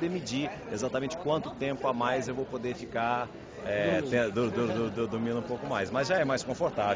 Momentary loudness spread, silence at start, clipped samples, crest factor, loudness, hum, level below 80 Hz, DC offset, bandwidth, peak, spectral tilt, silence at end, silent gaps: 7 LU; 0 s; under 0.1%; 18 dB; -31 LUFS; none; -58 dBFS; under 0.1%; 7.8 kHz; -14 dBFS; -5.5 dB/octave; 0 s; none